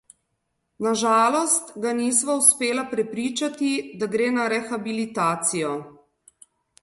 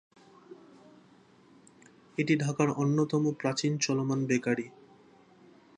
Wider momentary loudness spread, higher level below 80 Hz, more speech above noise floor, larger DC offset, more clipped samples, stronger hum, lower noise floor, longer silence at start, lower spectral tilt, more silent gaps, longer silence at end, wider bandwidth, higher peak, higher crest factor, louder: first, 11 LU vs 7 LU; first, -70 dBFS vs -76 dBFS; first, 53 dB vs 31 dB; neither; neither; neither; first, -75 dBFS vs -59 dBFS; first, 0.8 s vs 0.5 s; second, -2.5 dB/octave vs -5.5 dB/octave; neither; second, 0.9 s vs 1.1 s; first, 12 kHz vs 10.5 kHz; first, -2 dBFS vs -12 dBFS; about the same, 22 dB vs 20 dB; first, -22 LUFS vs -29 LUFS